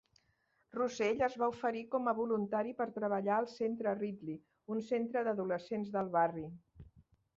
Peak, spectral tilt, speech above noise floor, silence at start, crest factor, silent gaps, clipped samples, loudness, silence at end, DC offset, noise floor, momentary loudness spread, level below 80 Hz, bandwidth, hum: -20 dBFS; -5 dB/octave; 41 dB; 0.75 s; 18 dB; none; under 0.1%; -36 LUFS; 0.35 s; under 0.1%; -77 dBFS; 12 LU; -72 dBFS; 7.6 kHz; none